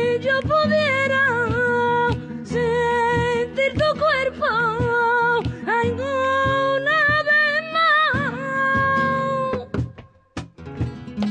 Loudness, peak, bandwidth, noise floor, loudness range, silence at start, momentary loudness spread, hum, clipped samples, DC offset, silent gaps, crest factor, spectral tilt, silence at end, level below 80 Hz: -20 LUFS; -8 dBFS; 9.6 kHz; -43 dBFS; 2 LU; 0 s; 12 LU; none; under 0.1%; under 0.1%; none; 12 dB; -6 dB/octave; 0 s; -42 dBFS